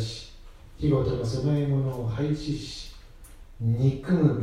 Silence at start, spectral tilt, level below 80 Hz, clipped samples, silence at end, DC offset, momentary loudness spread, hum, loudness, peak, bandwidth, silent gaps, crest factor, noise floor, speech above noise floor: 0 s; -7.5 dB/octave; -44 dBFS; under 0.1%; 0 s; under 0.1%; 15 LU; none; -27 LUFS; -10 dBFS; 11.5 kHz; none; 16 dB; -46 dBFS; 21 dB